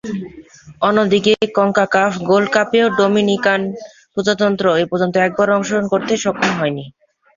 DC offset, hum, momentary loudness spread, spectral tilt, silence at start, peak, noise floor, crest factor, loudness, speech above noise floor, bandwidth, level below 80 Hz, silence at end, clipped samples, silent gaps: under 0.1%; none; 10 LU; -5 dB/octave; 0.05 s; -2 dBFS; -40 dBFS; 14 dB; -16 LUFS; 25 dB; 7.6 kHz; -56 dBFS; 0.45 s; under 0.1%; none